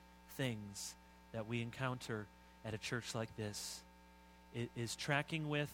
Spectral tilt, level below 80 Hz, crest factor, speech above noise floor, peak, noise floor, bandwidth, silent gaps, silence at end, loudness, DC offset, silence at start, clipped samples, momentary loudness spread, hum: -4.5 dB/octave; -68 dBFS; 24 dB; 20 dB; -20 dBFS; -63 dBFS; 16.5 kHz; none; 0 s; -44 LUFS; under 0.1%; 0 s; under 0.1%; 18 LU; none